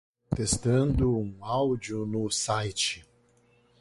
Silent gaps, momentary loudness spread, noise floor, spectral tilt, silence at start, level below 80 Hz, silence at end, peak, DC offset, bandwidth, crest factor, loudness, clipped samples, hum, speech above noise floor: none; 7 LU; -64 dBFS; -4.5 dB/octave; 0.3 s; -44 dBFS; 0.8 s; -12 dBFS; under 0.1%; 11.5 kHz; 16 dB; -28 LUFS; under 0.1%; 60 Hz at -50 dBFS; 36 dB